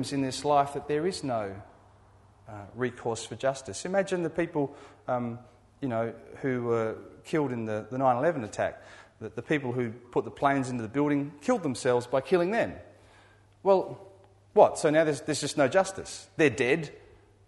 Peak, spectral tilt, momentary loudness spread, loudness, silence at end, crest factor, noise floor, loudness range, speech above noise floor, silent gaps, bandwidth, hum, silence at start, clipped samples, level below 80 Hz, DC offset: -6 dBFS; -5.5 dB/octave; 15 LU; -28 LUFS; 0.5 s; 22 dB; -58 dBFS; 6 LU; 30 dB; none; 11.5 kHz; none; 0 s; under 0.1%; -64 dBFS; under 0.1%